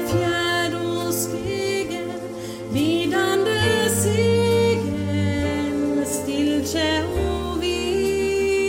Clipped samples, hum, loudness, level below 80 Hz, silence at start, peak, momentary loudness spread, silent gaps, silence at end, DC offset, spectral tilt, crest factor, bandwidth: under 0.1%; none; -22 LUFS; -40 dBFS; 0 s; -8 dBFS; 6 LU; none; 0 s; under 0.1%; -4.5 dB/octave; 14 dB; 16.5 kHz